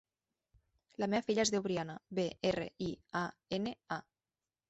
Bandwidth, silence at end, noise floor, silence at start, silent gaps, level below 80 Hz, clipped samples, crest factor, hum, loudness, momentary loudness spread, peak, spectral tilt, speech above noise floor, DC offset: 8.2 kHz; 0.7 s; under -90 dBFS; 1 s; none; -68 dBFS; under 0.1%; 18 dB; none; -37 LUFS; 11 LU; -20 dBFS; -4.5 dB/octave; over 54 dB; under 0.1%